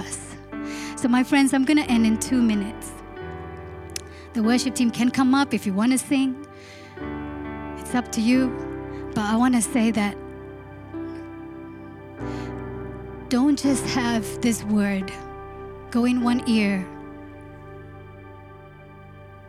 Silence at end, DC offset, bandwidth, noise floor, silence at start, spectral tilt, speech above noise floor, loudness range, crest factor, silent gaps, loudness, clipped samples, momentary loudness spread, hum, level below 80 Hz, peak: 0 s; under 0.1%; 14 kHz; -44 dBFS; 0 s; -4.5 dB/octave; 23 dB; 5 LU; 18 dB; none; -23 LUFS; under 0.1%; 21 LU; 50 Hz at -55 dBFS; -48 dBFS; -6 dBFS